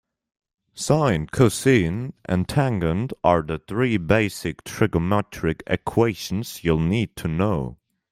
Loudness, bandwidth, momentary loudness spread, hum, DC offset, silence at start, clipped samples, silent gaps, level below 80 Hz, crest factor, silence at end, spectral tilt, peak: -22 LUFS; 16 kHz; 9 LU; none; under 0.1%; 0.75 s; under 0.1%; none; -44 dBFS; 20 dB; 0.4 s; -6 dB/octave; -4 dBFS